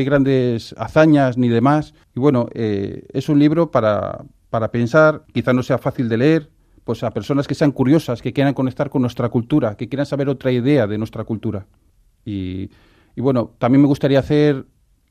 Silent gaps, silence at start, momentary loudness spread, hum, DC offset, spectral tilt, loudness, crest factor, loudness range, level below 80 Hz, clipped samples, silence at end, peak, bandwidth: none; 0 s; 12 LU; none; under 0.1%; -8 dB/octave; -18 LUFS; 16 dB; 5 LU; -48 dBFS; under 0.1%; 0.5 s; -2 dBFS; 13.5 kHz